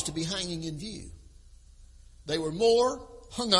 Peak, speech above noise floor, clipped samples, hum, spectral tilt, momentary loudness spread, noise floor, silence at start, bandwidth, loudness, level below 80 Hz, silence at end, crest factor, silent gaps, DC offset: -8 dBFS; 25 dB; under 0.1%; none; -3.5 dB/octave; 20 LU; -53 dBFS; 0 s; 11.5 kHz; -29 LUFS; -52 dBFS; 0 s; 22 dB; none; under 0.1%